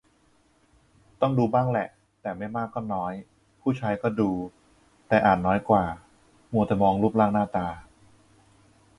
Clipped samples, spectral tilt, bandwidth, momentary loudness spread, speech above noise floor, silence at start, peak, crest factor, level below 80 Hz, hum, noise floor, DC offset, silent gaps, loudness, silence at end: under 0.1%; -8.5 dB/octave; 11 kHz; 14 LU; 39 dB; 1.2 s; -6 dBFS; 20 dB; -52 dBFS; none; -63 dBFS; under 0.1%; none; -25 LUFS; 1.15 s